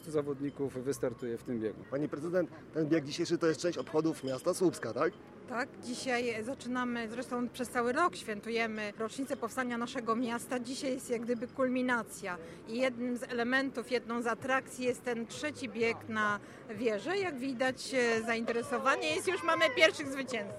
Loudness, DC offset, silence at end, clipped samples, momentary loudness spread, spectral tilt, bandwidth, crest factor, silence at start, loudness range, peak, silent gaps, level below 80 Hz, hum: -34 LUFS; under 0.1%; 0 s; under 0.1%; 8 LU; -4 dB/octave; 15 kHz; 24 dB; 0 s; 3 LU; -10 dBFS; none; -70 dBFS; none